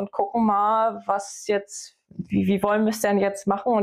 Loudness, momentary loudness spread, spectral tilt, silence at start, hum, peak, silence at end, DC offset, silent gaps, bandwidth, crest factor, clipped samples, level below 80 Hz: -23 LUFS; 13 LU; -5.5 dB/octave; 0 s; none; -8 dBFS; 0 s; under 0.1%; none; 15.5 kHz; 16 dB; under 0.1%; -60 dBFS